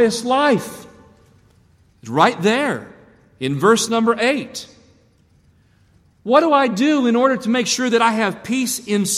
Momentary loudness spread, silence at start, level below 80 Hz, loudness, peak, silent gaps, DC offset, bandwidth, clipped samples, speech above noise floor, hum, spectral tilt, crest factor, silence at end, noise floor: 12 LU; 0 s; -60 dBFS; -17 LUFS; -2 dBFS; none; under 0.1%; 15.5 kHz; under 0.1%; 38 dB; none; -4 dB/octave; 18 dB; 0 s; -55 dBFS